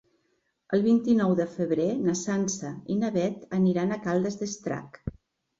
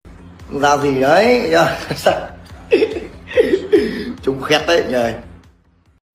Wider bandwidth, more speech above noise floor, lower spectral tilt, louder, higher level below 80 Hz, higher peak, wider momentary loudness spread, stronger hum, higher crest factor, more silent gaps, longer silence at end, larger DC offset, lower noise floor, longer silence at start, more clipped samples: second, 7.8 kHz vs 16 kHz; first, 47 dB vs 39 dB; first, -6 dB/octave vs -4.5 dB/octave; second, -27 LUFS vs -16 LUFS; second, -56 dBFS vs -42 dBFS; second, -12 dBFS vs 0 dBFS; about the same, 11 LU vs 10 LU; neither; about the same, 16 dB vs 16 dB; neither; second, 0.5 s vs 0.75 s; neither; first, -74 dBFS vs -54 dBFS; first, 0.7 s vs 0.05 s; neither